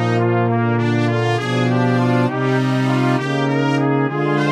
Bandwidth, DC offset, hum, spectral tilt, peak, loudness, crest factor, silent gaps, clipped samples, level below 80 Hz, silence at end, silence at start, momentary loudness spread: 10 kHz; under 0.1%; none; -7.5 dB/octave; -4 dBFS; -17 LUFS; 12 dB; none; under 0.1%; -68 dBFS; 0 s; 0 s; 2 LU